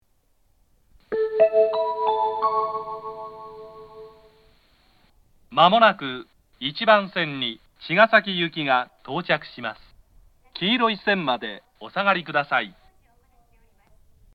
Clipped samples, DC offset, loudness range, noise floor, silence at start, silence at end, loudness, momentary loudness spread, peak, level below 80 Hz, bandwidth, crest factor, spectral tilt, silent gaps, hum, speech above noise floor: under 0.1%; under 0.1%; 6 LU; -66 dBFS; 1.1 s; 1.65 s; -22 LUFS; 20 LU; 0 dBFS; -62 dBFS; 5.8 kHz; 24 dB; -6.5 dB/octave; none; none; 44 dB